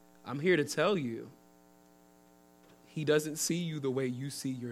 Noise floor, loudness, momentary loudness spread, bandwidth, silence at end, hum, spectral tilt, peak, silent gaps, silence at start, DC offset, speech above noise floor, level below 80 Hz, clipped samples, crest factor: -62 dBFS; -32 LUFS; 13 LU; 16 kHz; 0 s; none; -4.5 dB/octave; -16 dBFS; none; 0.25 s; under 0.1%; 29 dB; -78 dBFS; under 0.1%; 20 dB